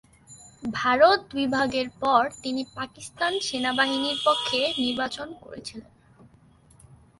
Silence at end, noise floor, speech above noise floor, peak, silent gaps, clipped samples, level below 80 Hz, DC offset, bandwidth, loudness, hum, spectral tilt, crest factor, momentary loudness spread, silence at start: 1.4 s; -56 dBFS; 31 dB; -6 dBFS; none; under 0.1%; -60 dBFS; under 0.1%; 11.5 kHz; -24 LUFS; none; -3 dB/octave; 20 dB; 18 LU; 0.3 s